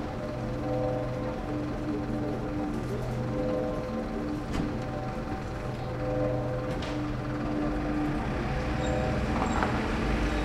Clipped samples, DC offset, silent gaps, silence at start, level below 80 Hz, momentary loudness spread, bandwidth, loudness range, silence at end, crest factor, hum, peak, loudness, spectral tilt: under 0.1%; under 0.1%; none; 0 s; -38 dBFS; 5 LU; 13.5 kHz; 3 LU; 0 s; 20 dB; none; -10 dBFS; -31 LUFS; -7 dB/octave